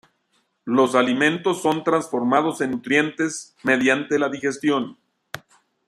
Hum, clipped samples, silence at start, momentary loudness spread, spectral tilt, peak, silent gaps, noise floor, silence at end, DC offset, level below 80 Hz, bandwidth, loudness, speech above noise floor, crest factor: none; under 0.1%; 0.65 s; 16 LU; -4.5 dB/octave; -2 dBFS; none; -68 dBFS; 0.5 s; under 0.1%; -68 dBFS; 14 kHz; -21 LUFS; 47 dB; 20 dB